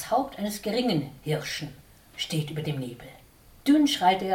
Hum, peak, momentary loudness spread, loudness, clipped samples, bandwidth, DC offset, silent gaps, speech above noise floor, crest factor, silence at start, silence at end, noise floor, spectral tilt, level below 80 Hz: none; -8 dBFS; 15 LU; -27 LUFS; under 0.1%; 17.5 kHz; under 0.1%; none; 22 dB; 18 dB; 0 s; 0 s; -48 dBFS; -5 dB/octave; -58 dBFS